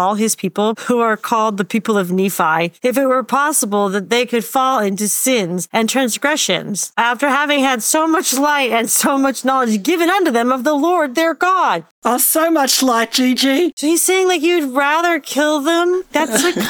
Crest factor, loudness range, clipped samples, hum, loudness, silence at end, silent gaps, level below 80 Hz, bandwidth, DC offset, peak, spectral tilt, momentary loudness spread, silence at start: 14 dB; 2 LU; under 0.1%; none; -15 LUFS; 0 s; 11.91-12.02 s, 13.73-13.77 s; -66 dBFS; over 20 kHz; under 0.1%; 0 dBFS; -3 dB/octave; 4 LU; 0 s